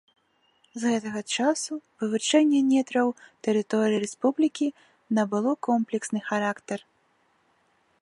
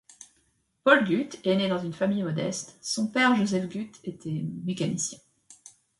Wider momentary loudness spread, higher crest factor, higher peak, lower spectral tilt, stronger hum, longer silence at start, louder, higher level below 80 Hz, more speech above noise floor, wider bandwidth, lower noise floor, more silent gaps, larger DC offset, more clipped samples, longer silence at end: second, 10 LU vs 13 LU; second, 18 dB vs 24 dB; second, -8 dBFS vs -4 dBFS; about the same, -4 dB/octave vs -4.5 dB/octave; neither; first, 0.75 s vs 0.2 s; about the same, -26 LUFS vs -27 LUFS; second, -78 dBFS vs -68 dBFS; about the same, 42 dB vs 44 dB; about the same, 11.5 kHz vs 11.5 kHz; about the same, -67 dBFS vs -70 dBFS; neither; neither; neither; first, 1.25 s vs 0.3 s